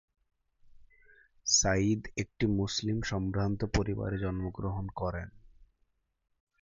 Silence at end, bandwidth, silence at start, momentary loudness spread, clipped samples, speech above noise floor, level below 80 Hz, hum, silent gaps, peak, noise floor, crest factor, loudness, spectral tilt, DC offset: 1.2 s; 7.8 kHz; 0.8 s; 11 LU; under 0.1%; 44 dB; -46 dBFS; none; none; -12 dBFS; -75 dBFS; 22 dB; -31 LUFS; -4 dB/octave; under 0.1%